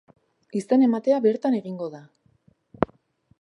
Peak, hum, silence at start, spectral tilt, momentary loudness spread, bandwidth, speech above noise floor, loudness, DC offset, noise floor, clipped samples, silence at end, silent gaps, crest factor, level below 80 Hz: -2 dBFS; none; 0.55 s; -7.5 dB/octave; 13 LU; 11 kHz; 40 dB; -24 LUFS; under 0.1%; -62 dBFS; under 0.1%; 0.55 s; none; 24 dB; -60 dBFS